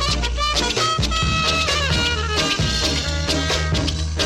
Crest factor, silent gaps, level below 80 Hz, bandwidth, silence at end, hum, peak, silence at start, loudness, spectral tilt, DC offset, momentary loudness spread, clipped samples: 12 dB; none; -26 dBFS; 15 kHz; 0 s; none; -8 dBFS; 0 s; -19 LUFS; -3.5 dB/octave; under 0.1%; 3 LU; under 0.1%